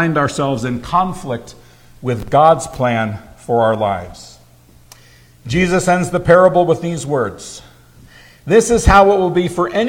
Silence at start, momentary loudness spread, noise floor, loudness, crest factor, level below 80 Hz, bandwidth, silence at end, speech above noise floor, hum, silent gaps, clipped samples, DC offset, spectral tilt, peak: 0 s; 17 LU; -46 dBFS; -15 LUFS; 16 dB; -32 dBFS; 16.5 kHz; 0 s; 32 dB; none; none; under 0.1%; under 0.1%; -5.5 dB/octave; 0 dBFS